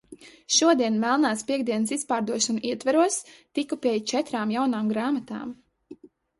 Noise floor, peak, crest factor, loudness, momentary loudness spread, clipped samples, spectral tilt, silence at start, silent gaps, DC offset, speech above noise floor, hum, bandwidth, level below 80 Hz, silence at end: -48 dBFS; -8 dBFS; 18 dB; -25 LUFS; 11 LU; under 0.1%; -3 dB/octave; 0.1 s; none; under 0.1%; 24 dB; none; 11.5 kHz; -70 dBFS; 0.45 s